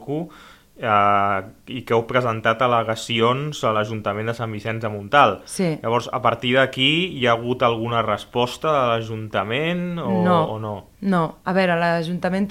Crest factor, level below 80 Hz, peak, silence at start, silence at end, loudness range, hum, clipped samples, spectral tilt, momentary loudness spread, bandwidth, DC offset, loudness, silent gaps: 20 dB; -54 dBFS; -2 dBFS; 0 s; 0 s; 2 LU; none; under 0.1%; -5.5 dB/octave; 10 LU; 16 kHz; under 0.1%; -21 LUFS; none